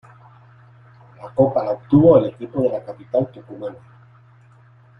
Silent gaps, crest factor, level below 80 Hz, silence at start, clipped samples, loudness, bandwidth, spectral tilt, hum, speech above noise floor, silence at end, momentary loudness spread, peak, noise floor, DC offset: none; 20 dB; -54 dBFS; 1.2 s; under 0.1%; -18 LUFS; 5.6 kHz; -11 dB/octave; none; 31 dB; 1.25 s; 20 LU; -2 dBFS; -50 dBFS; under 0.1%